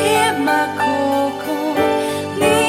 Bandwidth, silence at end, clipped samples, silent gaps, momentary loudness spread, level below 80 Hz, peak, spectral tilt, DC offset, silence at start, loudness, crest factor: 17 kHz; 0 s; under 0.1%; none; 5 LU; -52 dBFS; -2 dBFS; -4 dB/octave; under 0.1%; 0 s; -17 LUFS; 14 dB